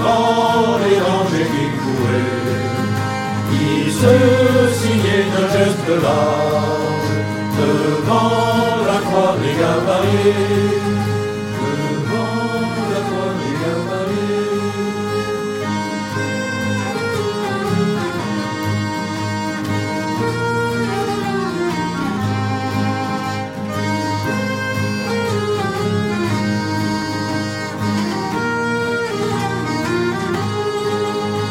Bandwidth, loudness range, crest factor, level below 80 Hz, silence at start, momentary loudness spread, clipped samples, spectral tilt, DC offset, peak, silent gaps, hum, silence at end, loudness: 16.5 kHz; 5 LU; 18 dB; -50 dBFS; 0 s; 6 LU; under 0.1%; -6 dB/octave; under 0.1%; 0 dBFS; none; none; 0 s; -18 LUFS